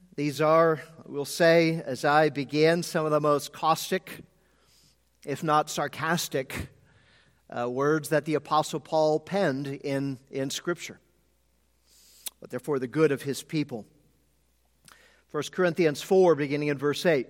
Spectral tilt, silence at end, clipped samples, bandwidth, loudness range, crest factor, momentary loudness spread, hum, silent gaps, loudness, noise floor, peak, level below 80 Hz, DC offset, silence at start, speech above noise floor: -5 dB/octave; 0.05 s; under 0.1%; 16.5 kHz; 7 LU; 20 dB; 15 LU; none; none; -26 LUFS; -69 dBFS; -8 dBFS; -64 dBFS; under 0.1%; 0.15 s; 43 dB